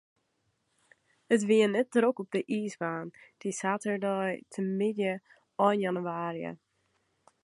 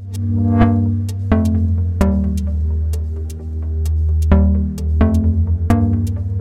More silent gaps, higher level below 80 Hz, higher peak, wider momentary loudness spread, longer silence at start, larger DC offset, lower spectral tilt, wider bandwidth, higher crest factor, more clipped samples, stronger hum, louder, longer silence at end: neither; second, -80 dBFS vs -20 dBFS; second, -10 dBFS vs -2 dBFS; first, 14 LU vs 8 LU; first, 1.3 s vs 0 s; neither; second, -5.5 dB/octave vs -9 dB/octave; about the same, 11.5 kHz vs 11 kHz; first, 22 dB vs 14 dB; neither; neither; second, -30 LUFS vs -17 LUFS; first, 0.9 s vs 0 s